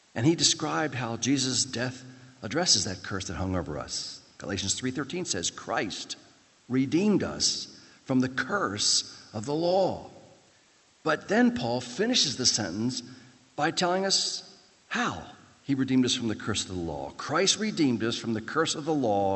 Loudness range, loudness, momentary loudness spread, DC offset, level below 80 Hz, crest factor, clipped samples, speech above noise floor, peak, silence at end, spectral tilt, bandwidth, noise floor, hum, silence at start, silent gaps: 3 LU; -27 LUFS; 12 LU; under 0.1%; -62 dBFS; 20 dB; under 0.1%; 34 dB; -8 dBFS; 0 s; -3 dB/octave; 8.6 kHz; -62 dBFS; none; 0.15 s; none